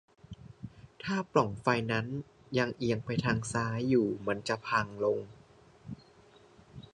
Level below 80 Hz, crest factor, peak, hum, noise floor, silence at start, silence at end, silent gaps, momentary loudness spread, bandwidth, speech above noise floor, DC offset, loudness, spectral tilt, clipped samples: -60 dBFS; 24 dB; -10 dBFS; none; -59 dBFS; 0.3 s; 0.15 s; none; 21 LU; 11 kHz; 28 dB; under 0.1%; -32 LUFS; -6 dB/octave; under 0.1%